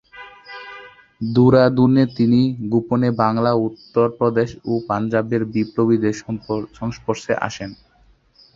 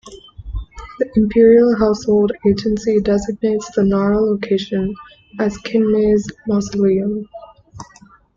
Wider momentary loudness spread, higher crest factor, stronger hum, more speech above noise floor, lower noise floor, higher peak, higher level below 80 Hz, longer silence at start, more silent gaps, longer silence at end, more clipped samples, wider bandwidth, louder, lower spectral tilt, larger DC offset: about the same, 20 LU vs 19 LU; about the same, 18 dB vs 14 dB; neither; first, 37 dB vs 32 dB; first, -55 dBFS vs -47 dBFS; about the same, 0 dBFS vs -2 dBFS; second, -52 dBFS vs -38 dBFS; about the same, 0.15 s vs 0.05 s; neither; first, 0.8 s vs 0.55 s; neither; about the same, 7.6 kHz vs 7.6 kHz; second, -19 LUFS vs -16 LUFS; about the same, -7.5 dB/octave vs -7 dB/octave; neither